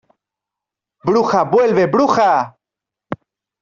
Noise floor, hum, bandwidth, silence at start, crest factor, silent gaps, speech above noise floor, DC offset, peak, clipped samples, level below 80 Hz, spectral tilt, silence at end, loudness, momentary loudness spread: -85 dBFS; none; 7.4 kHz; 1.05 s; 14 dB; none; 72 dB; under 0.1%; -2 dBFS; under 0.1%; -58 dBFS; -6.5 dB/octave; 0.45 s; -15 LUFS; 18 LU